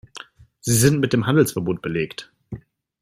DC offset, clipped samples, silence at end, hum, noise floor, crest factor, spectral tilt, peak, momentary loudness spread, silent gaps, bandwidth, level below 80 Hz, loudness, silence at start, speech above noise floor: under 0.1%; under 0.1%; 0.45 s; none; -43 dBFS; 20 dB; -5 dB/octave; -2 dBFS; 22 LU; none; 16 kHz; -50 dBFS; -20 LUFS; 0.15 s; 24 dB